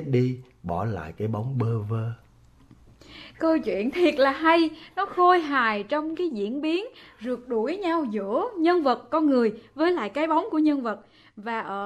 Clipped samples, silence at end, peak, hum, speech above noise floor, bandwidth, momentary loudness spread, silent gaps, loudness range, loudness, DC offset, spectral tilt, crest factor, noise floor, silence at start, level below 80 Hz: under 0.1%; 0 s; -6 dBFS; none; 29 dB; 10 kHz; 12 LU; none; 6 LU; -25 LUFS; under 0.1%; -7.5 dB/octave; 18 dB; -54 dBFS; 0 s; -58 dBFS